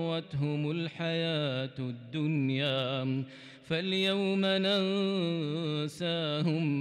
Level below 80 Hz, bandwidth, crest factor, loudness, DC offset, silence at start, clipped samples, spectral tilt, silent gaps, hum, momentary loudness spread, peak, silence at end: -72 dBFS; 12 kHz; 12 dB; -31 LUFS; under 0.1%; 0 s; under 0.1%; -6.5 dB/octave; none; none; 7 LU; -18 dBFS; 0 s